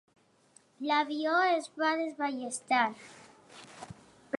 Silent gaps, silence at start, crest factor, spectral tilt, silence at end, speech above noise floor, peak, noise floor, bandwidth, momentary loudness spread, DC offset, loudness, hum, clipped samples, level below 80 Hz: none; 0.8 s; 18 dB; -2.5 dB/octave; 0 s; 34 dB; -14 dBFS; -64 dBFS; 11.5 kHz; 22 LU; under 0.1%; -30 LUFS; none; under 0.1%; -76 dBFS